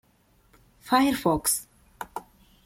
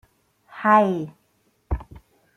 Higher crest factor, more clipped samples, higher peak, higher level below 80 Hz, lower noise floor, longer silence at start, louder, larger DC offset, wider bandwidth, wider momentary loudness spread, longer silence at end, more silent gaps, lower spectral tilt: about the same, 20 dB vs 20 dB; neither; second, -8 dBFS vs -4 dBFS; second, -54 dBFS vs -40 dBFS; about the same, -63 dBFS vs -66 dBFS; first, 0.85 s vs 0.55 s; about the same, -24 LUFS vs -22 LUFS; neither; first, 16.5 kHz vs 13.5 kHz; first, 18 LU vs 15 LU; about the same, 0.45 s vs 0.4 s; neither; second, -3.5 dB/octave vs -8 dB/octave